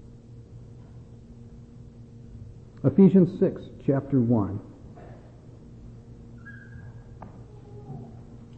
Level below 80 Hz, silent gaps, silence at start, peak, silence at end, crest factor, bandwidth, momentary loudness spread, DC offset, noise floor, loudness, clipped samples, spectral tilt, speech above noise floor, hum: -52 dBFS; none; 0.4 s; -8 dBFS; 0.15 s; 20 dB; 4.2 kHz; 27 LU; under 0.1%; -47 dBFS; -23 LUFS; under 0.1%; -11 dB/octave; 26 dB; none